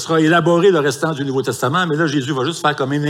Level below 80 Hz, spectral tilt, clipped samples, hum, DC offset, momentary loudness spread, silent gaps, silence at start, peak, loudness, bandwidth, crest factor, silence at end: -62 dBFS; -5.5 dB/octave; under 0.1%; none; under 0.1%; 7 LU; none; 0 s; -2 dBFS; -16 LUFS; 16 kHz; 14 dB; 0 s